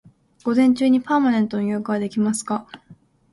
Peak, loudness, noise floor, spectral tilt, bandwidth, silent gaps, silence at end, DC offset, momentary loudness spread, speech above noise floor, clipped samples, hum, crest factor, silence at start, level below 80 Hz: -6 dBFS; -20 LUFS; -51 dBFS; -5.5 dB/octave; 11.5 kHz; none; 0.4 s; under 0.1%; 10 LU; 31 dB; under 0.1%; none; 14 dB; 0.45 s; -62 dBFS